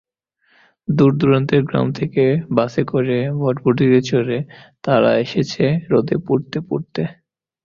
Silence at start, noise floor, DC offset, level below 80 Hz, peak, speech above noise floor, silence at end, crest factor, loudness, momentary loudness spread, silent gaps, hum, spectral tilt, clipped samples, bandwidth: 0.9 s; -63 dBFS; under 0.1%; -52 dBFS; -2 dBFS; 46 dB; 0.55 s; 16 dB; -18 LUFS; 10 LU; none; none; -7.5 dB/octave; under 0.1%; 7.2 kHz